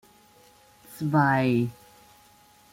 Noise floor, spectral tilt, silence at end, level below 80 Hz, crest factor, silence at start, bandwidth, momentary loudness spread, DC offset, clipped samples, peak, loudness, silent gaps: -57 dBFS; -7.5 dB/octave; 1 s; -64 dBFS; 18 dB; 0.9 s; 16.5 kHz; 12 LU; under 0.1%; under 0.1%; -10 dBFS; -24 LUFS; none